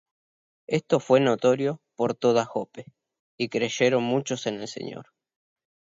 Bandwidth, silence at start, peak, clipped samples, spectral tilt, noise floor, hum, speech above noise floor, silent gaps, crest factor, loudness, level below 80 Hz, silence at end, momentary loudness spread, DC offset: 7.8 kHz; 0.7 s; -6 dBFS; under 0.1%; -5 dB/octave; under -90 dBFS; none; over 66 dB; 3.19-3.38 s; 20 dB; -25 LUFS; -72 dBFS; 0.95 s; 15 LU; under 0.1%